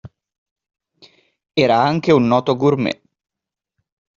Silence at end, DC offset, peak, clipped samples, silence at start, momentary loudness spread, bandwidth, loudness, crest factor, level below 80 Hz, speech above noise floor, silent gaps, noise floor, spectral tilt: 1.25 s; under 0.1%; -2 dBFS; under 0.1%; 0.05 s; 10 LU; 7.4 kHz; -16 LUFS; 18 dB; -58 dBFS; 61 dB; 0.38-0.56 s; -76 dBFS; -5 dB/octave